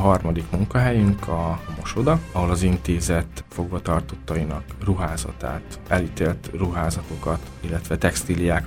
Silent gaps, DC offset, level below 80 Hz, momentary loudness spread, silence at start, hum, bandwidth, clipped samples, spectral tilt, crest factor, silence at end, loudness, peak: none; under 0.1%; -32 dBFS; 9 LU; 0 s; none; 16.5 kHz; under 0.1%; -6 dB/octave; 20 dB; 0 s; -24 LUFS; -4 dBFS